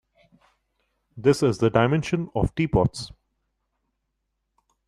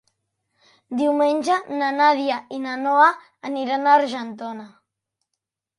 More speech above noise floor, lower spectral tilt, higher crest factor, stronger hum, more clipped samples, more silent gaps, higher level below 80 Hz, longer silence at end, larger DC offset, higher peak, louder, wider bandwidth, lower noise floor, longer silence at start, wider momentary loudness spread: second, 56 dB vs 62 dB; first, -7 dB/octave vs -3.5 dB/octave; about the same, 22 dB vs 20 dB; neither; neither; neither; first, -44 dBFS vs -74 dBFS; first, 1.8 s vs 1.1 s; neither; about the same, -4 dBFS vs -2 dBFS; second, -23 LUFS vs -20 LUFS; first, 13 kHz vs 11.5 kHz; second, -78 dBFS vs -82 dBFS; first, 1.15 s vs 0.9 s; second, 6 LU vs 15 LU